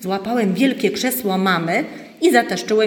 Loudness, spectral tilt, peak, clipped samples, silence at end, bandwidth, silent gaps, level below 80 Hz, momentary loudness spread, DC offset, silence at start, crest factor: -18 LUFS; -4.5 dB/octave; 0 dBFS; under 0.1%; 0 s; 18 kHz; none; -64 dBFS; 6 LU; under 0.1%; 0 s; 18 dB